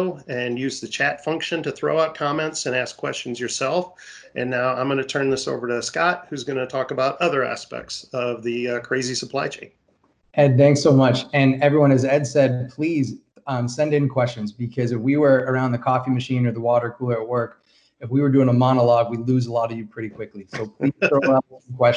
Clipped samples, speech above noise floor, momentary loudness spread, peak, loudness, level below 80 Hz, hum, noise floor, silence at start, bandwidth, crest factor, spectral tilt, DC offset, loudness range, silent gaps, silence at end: under 0.1%; 42 dB; 12 LU; -4 dBFS; -21 LUFS; -60 dBFS; none; -63 dBFS; 0 s; 10.5 kHz; 18 dB; -6 dB/octave; under 0.1%; 6 LU; none; 0 s